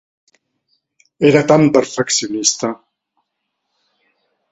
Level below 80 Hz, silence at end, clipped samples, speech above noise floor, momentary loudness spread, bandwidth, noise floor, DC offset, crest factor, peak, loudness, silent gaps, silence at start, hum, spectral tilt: -58 dBFS; 1.8 s; under 0.1%; 60 dB; 11 LU; 8.4 kHz; -74 dBFS; under 0.1%; 18 dB; 0 dBFS; -14 LUFS; none; 1.2 s; none; -4 dB/octave